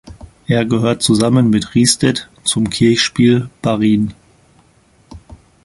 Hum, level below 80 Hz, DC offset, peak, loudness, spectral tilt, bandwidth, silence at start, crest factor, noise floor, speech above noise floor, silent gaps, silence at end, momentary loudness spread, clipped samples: none; -44 dBFS; under 0.1%; 0 dBFS; -14 LUFS; -5 dB/octave; 11.5 kHz; 0.05 s; 16 dB; -52 dBFS; 38 dB; none; 0.3 s; 6 LU; under 0.1%